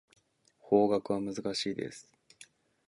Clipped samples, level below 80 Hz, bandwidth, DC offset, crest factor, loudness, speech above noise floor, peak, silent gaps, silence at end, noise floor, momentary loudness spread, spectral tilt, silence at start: under 0.1%; -70 dBFS; 11.5 kHz; under 0.1%; 22 dB; -31 LUFS; 35 dB; -12 dBFS; none; 0.45 s; -66 dBFS; 14 LU; -5 dB/octave; 0.65 s